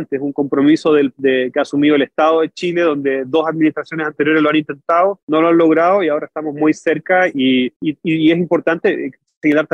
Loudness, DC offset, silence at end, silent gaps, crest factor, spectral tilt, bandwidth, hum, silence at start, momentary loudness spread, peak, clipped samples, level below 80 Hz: -15 LUFS; under 0.1%; 0.1 s; 5.23-5.28 s, 7.76-7.80 s, 9.37-9.41 s; 12 dB; -6.5 dB/octave; 8.4 kHz; none; 0 s; 7 LU; -4 dBFS; under 0.1%; -64 dBFS